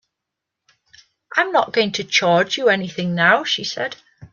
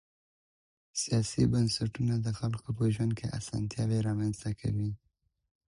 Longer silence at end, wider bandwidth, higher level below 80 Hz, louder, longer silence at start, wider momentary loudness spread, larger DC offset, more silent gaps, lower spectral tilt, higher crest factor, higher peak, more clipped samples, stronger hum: second, 0.05 s vs 0.75 s; second, 7.4 kHz vs 11.5 kHz; second, -64 dBFS vs -54 dBFS; first, -18 LUFS vs -32 LUFS; first, 1.3 s vs 0.95 s; about the same, 10 LU vs 8 LU; neither; neither; second, -3.5 dB/octave vs -6 dB/octave; about the same, 20 dB vs 18 dB; first, 0 dBFS vs -14 dBFS; neither; neither